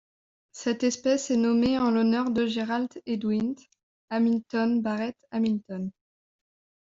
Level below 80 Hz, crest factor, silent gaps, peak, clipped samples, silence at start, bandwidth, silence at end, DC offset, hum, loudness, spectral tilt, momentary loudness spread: -62 dBFS; 14 dB; 3.83-4.08 s; -14 dBFS; under 0.1%; 0.55 s; 7.8 kHz; 0.95 s; under 0.1%; none; -27 LUFS; -5 dB/octave; 10 LU